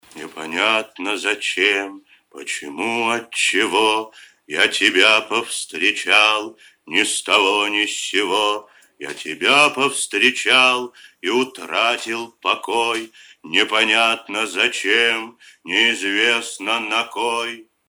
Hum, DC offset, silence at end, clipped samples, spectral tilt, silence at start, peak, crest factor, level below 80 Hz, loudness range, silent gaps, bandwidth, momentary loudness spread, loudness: none; under 0.1%; 0.25 s; under 0.1%; -1 dB/octave; 0.15 s; 0 dBFS; 20 dB; -70 dBFS; 4 LU; none; 19 kHz; 14 LU; -17 LUFS